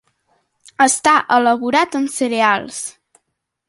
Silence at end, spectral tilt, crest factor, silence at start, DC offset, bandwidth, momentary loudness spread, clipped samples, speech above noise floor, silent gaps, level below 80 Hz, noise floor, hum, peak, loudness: 0.8 s; -2 dB/octave; 16 dB; 0.8 s; under 0.1%; 11.5 kHz; 12 LU; under 0.1%; 59 dB; none; -62 dBFS; -74 dBFS; none; -2 dBFS; -15 LUFS